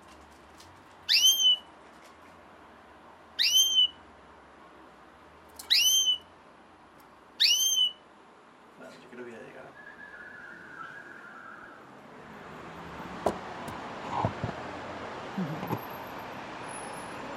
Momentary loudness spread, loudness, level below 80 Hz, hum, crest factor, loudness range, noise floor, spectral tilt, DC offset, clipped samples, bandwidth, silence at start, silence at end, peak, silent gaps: 26 LU; -25 LUFS; -64 dBFS; none; 22 dB; 20 LU; -55 dBFS; -0.5 dB/octave; under 0.1%; under 0.1%; 16 kHz; 0 s; 0 s; -10 dBFS; none